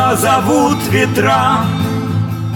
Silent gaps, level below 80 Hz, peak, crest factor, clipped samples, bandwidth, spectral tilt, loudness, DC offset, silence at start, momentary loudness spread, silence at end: none; -46 dBFS; 0 dBFS; 12 dB; under 0.1%; over 20 kHz; -5.5 dB/octave; -13 LUFS; under 0.1%; 0 s; 6 LU; 0 s